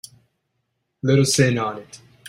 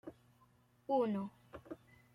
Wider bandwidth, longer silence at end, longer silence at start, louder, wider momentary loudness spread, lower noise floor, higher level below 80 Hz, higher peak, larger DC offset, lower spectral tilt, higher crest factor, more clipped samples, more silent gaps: first, 16 kHz vs 13 kHz; second, 0 s vs 0.4 s; first, 1.05 s vs 0.05 s; first, -19 LUFS vs -38 LUFS; second, 12 LU vs 21 LU; first, -74 dBFS vs -70 dBFS; first, -56 dBFS vs -76 dBFS; first, -4 dBFS vs -24 dBFS; neither; second, -5 dB/octave vs -8.5 dB/octave; about the same, 20 dB vs 18 dB; neither; neither